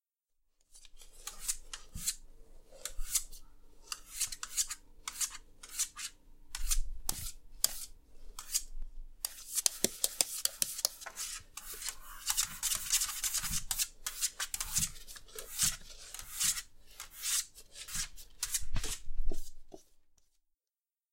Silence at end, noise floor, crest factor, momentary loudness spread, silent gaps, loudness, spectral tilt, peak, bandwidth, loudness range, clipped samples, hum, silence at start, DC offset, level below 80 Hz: 1.3 s; under -90 dBFS; 32 dB; 16 LU; none; -35 LUFS; 0 dB/octave; -4 dBFS; 16.5 kHz; 6 LU; under 0.1%; none; 0.75 s; under 0.1%; -44 dBFS